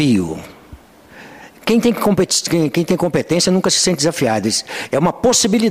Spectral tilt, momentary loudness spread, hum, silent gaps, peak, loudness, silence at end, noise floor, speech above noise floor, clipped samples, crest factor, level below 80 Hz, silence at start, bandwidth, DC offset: -4 dB/octave; 6 LU; none; none; -4 dBFS; -16 LUFS; 0 s; -41 dBFS; 26 dB; under 0.1%; 12 dB; -48 dBFS; 0 s; 16 kHz; 0.2%